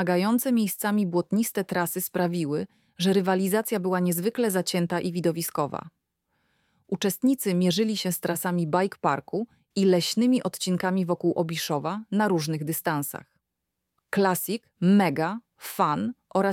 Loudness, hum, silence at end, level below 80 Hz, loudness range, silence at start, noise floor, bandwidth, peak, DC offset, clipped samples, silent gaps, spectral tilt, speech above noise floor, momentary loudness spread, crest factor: -26 LUFS; none; 0 s; -70 dBFS; 3 LU; 0 s; -83 dBFS; 17.5 kHz; -8 dBFS; under 0.1%; under 0.1%; none; -5 dB/octave; 58 dB; 8 LU; 18 dB